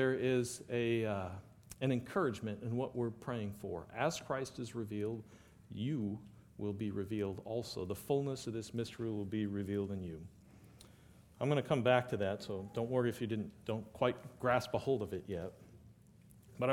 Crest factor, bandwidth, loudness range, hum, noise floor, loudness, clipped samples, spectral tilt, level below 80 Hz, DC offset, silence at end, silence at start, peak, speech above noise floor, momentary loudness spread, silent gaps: 24 dB; 17 kHz; 5 LU; none; -62 dBFS; -38 LUFS; under 0.1%; -6 dB/octave; -66 dBFS; under 0.1%; 0 s; 0 s; -14 dBFS; 24 dB; 10 LU; none